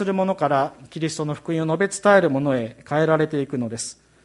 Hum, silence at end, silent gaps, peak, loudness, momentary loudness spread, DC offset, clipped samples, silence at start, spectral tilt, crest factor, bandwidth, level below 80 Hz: none; 0.3 s; none; -4 dBFS; -22 LUFS; 12 LU; under 0.1%; under 0.1%; 0 s; -5.5 dB/octave; 18 dB; 11.5 kHz; -62 dBFS